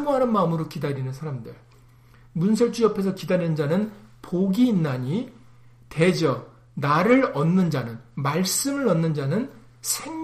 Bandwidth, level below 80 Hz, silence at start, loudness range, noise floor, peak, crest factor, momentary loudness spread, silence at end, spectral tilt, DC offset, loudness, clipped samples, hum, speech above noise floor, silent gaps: 15.5 kHz; -58 dBFS; 0 s; 3 LU; -52 dBFS; -6 dBFS; 18 dB; 13 LU; 0 s; -5.5 dB/octave; under 0.1%; -23 LUFS; under 0.1%; none; 29 dB; none